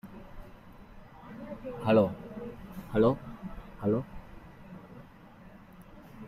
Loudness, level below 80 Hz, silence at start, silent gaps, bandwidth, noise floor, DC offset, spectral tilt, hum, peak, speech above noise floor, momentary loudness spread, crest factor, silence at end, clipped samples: -30 LUFS; -54 dBFS; 0.05 s; none; 14.5 kHz; -52 dBFS; under 0.1%; -9 dB/octave; none; -12 dBFS; 26 dB; 27 LU; 22 dB; 0 s; under 0.1%